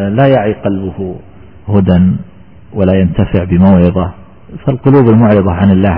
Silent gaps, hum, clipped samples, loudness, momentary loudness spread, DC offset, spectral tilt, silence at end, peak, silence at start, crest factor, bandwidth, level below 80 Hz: none; none; under 0.1%; -10 LUFS; 14 LU; 1%; -13.5 dB/octave; 0 s; 0 dBFS; 0 s; 10 dB; 3.4 kHz; -32 dBFS